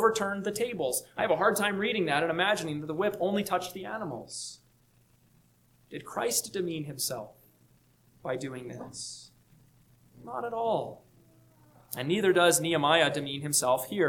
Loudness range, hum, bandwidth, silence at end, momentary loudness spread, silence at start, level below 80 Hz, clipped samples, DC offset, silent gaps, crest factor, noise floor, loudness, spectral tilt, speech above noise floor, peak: 10 LU; none; 19 kHz; 0 s; 17 LU; 0 s; -68 dBFS; under 0.1%; under 0.1%; none; 22 dB; -65 dBFS; -29 LUFS; -3 dB/octave; 35 dB; -8 dBFS